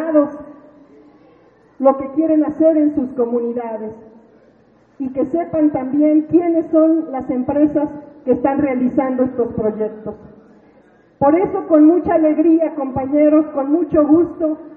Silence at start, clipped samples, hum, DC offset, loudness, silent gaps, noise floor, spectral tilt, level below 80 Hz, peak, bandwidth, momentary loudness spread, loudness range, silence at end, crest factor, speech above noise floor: 0 s; under 0.1%; none; under 0.1%; -16 LUFS; none; -52 dBFS; -11.5 dB/octave; -52 dBFS; 0 dBFS; 2.9 kHz; 11 LU; 5 LU; 0 s; 16 dB; 36 dB